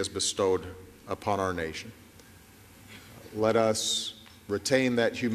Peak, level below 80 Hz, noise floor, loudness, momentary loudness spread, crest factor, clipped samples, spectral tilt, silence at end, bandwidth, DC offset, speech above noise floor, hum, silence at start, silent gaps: -10 dBFS; -62 dBFS; -53 dBFS; -28 LUFS; 22 LU; 20 dB; under 0.1%; -3.5 dB/octave; 0 s; 14.5 kHz; under 0.1%; 25 dB; none; 0 s; none